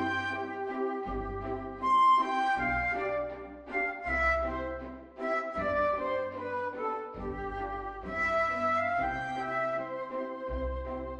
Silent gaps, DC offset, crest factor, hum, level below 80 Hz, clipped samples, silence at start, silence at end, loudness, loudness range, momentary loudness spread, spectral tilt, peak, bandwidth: none; under 0.1%; 16 dB; none; -46 dBFS; under 0.1%; 0 s; 0 s; -31 LUFS; 5 LU; 10 LU; -6 dB/octave; -16 dBFS; 10 kHz